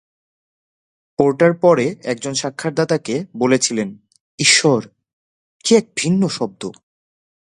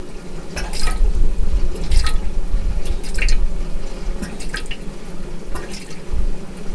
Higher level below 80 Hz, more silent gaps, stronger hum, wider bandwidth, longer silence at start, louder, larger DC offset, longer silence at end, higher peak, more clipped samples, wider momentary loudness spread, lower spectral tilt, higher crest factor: second, -62 dBFS vs -18 dBFS; first, 4.21-4.38 s, 5.13-5.60 s vs none; neither; about the same, 11.5 kHz vs 11 kHz; first, 1.2 s vs 0 s; first, -17 LUFS vs -26 LUFS; neither; first, 0.75 s vs 0 s; about the same, 0 dBFS vs -2 dBFS; neither; about the same, 12 LU vs 11 LU; about the same, -4 dB/octave vs -4.5 dB/octave; about the same, 18 dB vs 14 dB